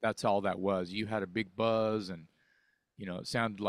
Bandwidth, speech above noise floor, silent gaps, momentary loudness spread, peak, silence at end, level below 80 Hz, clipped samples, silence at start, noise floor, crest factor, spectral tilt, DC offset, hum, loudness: 14 kHz; 40 dB; none; 13 LU; -16 dBFS; 0 s; -68 dBFS; under 0.1%; 0 s; -73 dBFS; 18 dB; -5.5 dB/octave; under 0.1%; none; -33 LUFS